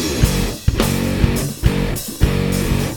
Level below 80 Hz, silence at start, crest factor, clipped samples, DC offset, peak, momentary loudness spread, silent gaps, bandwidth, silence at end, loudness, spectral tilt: -22 dBFS; 0 s; 16 dB; under 0.1%; under 0.1%; 0 dBFS; 3 LU; none; over 20 kHz; 0 s; -18 LUFS; -5 dB/octave